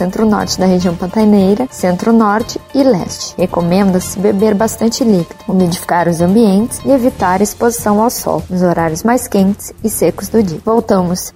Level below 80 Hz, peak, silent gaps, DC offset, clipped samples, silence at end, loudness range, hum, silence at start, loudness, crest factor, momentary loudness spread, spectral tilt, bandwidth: -38 dBFS; 0 dBFS; none; under 0.1%; under 0.1%; 0.05 s; 1 LU; none; 0 s; -13 LUFS; 12 dB; 5 LU; -6 dB/octave; 16.5 kHz